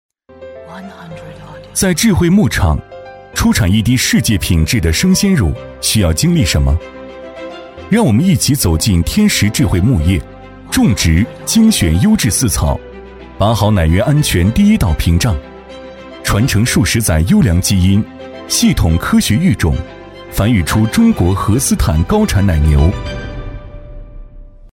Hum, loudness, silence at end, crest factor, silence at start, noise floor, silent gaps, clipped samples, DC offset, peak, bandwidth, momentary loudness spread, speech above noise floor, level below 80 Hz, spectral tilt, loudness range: none; -13 LUFS; 0.05 s; 12 dB; 0.4 s; -34 dBFS; none; under 0.1%; under 0.1%; -2 dBFS; 17 kHz; 20 LU; 23 dB; -22 dBFS; -5 dB/octave; 2 LU